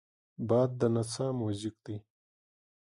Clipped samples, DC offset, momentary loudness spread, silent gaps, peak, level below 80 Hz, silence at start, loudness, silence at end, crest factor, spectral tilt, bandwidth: under 0.1%; under 0.1%; 16 LU; none; -16 dBFS; -66 dBFS; 0.4 s; -32 LUFS; 0.85 s; 18 dB; -7 dB/octave; 11.5 kHz